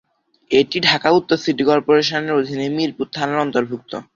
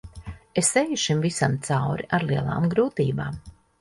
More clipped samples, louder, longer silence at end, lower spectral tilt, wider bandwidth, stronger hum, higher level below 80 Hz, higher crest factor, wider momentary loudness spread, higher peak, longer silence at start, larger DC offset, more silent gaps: neither; first, -18 LUFS vs -24 LUFS; second, 0.15 s vs 0.3 s; about the same, -5 dB/octave vs -4.5 dB/octave; second, 7.6 kHz vs 11.5 kHz; neither; second, -58 dBFS vs -50 dBFS; about the same, 18 dB vs 18 dB; second, 8 LU vs 12 LU; first, 0 dBFS vs -6 dBFS; first, 0.5 s vs 0.05 s; neither; neither